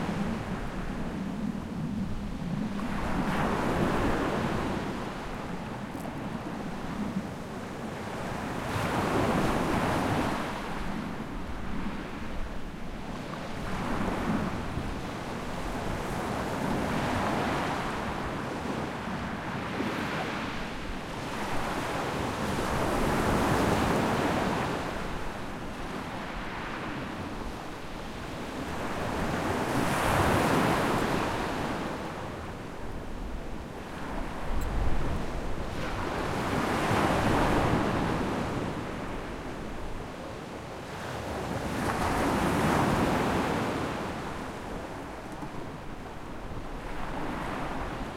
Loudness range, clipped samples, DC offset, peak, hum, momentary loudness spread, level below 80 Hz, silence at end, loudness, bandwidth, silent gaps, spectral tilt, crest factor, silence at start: 8 LU; under 0.1%; under 0.1%; -12 dBFS; none; 13 LU; -42 dBFS; 0 s; -32 LUFS; 16.5 kHz; none; -5.5 dB/octave; 18 dB; 0 s